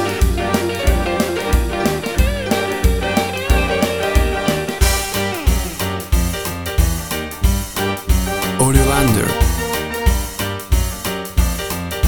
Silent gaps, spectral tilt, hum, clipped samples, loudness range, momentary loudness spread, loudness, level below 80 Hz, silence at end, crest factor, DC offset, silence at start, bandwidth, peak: none; -4.5 dB/octave; none; under 0.1%; 2 LU; 6 LU; -18 LUFS; -20 dBFS; 0 s; 16 dB; 0.3%; 0 s; over 20 kHz; 0 dBFS